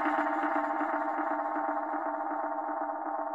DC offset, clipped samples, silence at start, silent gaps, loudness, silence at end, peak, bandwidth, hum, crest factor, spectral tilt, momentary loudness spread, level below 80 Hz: under 0.1%; under 0.1%; 0 s; none; -32 LUFS; 0 s; -16 dBFS; 7.8 kHz; none; 14 dB; -5 dB/octave; 5 LU; -86 dBFS